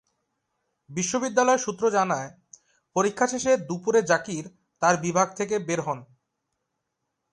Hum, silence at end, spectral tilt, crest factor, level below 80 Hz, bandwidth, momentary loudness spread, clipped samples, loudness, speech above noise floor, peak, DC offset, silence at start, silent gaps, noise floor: none; 1.3 s; -4 dB/octave; 20 dB; -68 dBFS; 11 kHz; 13 LU; under 0.1%; -25 LUFS; 56 dB; -6 dBFS; under 0.1%; 0.9 s; none; -80 dBFS